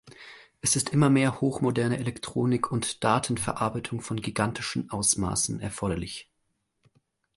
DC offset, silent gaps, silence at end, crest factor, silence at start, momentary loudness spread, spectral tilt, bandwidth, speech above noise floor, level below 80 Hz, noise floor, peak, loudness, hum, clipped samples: under 0.1%; none; 1.15 s; 20 dB; 0.05 s; 11 LU; -4.5 dB/octave; 12 kHz; 49 dB; -52 dBFS; -76 dBFS; -8 dBFS; -27 LUFS; none; under 0.1%